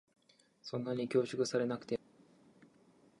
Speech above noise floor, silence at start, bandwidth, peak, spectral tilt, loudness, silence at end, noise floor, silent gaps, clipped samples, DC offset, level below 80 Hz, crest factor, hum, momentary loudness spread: 32 dB; 0.65 s; 11 kHz; -18 dBFS; -5.5 dB/octave; -37 LUFS; 1.25 s; -67 dBFS; none; under 0.1%; under 0.1%; -78 dBFS; 20 dB; none; 9 LU